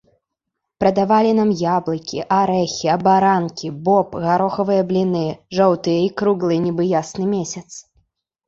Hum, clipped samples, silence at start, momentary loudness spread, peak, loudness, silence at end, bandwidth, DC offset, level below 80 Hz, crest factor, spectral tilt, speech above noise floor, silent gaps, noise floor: none; under 0.1%; 0.8 s; 9 LU; -2 dBFS; -18 LUFS; 0.65 s; 7.8 kHz; under 0.1%; -56 dBFS; 16 dB; -6 dB/octave; 62 dB; none; -79 dBFS